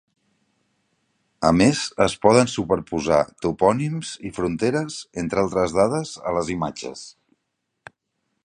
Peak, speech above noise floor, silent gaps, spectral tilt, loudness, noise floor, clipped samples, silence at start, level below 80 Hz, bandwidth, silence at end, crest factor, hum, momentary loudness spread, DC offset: 0 dBFS; 56 dB; none; -5.5 dB/octave; -21 LUFS; -77 dBFS; under 0.1%; 1.4 s; -48 dBFS; 11 kHz; 1.35 s; 22 dB; none; 13 LU; under 0.1%